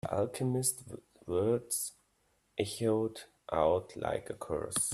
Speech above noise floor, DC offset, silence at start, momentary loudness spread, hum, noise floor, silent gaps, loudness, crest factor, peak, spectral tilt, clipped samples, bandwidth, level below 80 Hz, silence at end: 41 dB; under 0.1%; 0.05 s; 12 LU; none; -74 dBFS; none; -34 LUFS; 20 dB; -14 dBFS; -4.5 dB/octave; under 0.1%; 15.5 kHz; -62 dBFS; 0 s